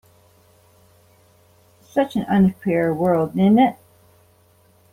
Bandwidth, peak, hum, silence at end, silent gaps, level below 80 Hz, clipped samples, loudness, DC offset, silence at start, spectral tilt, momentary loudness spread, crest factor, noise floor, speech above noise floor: 15 kHz; -4 dBFS; none; 1.2 s; none; -58 dBFS; under 0.1%; -19 LUFS; under 0.1%; 1.95 s; -8.5 dB/octave; 7 LU; 18 dB; -56 dBFS; 38 dB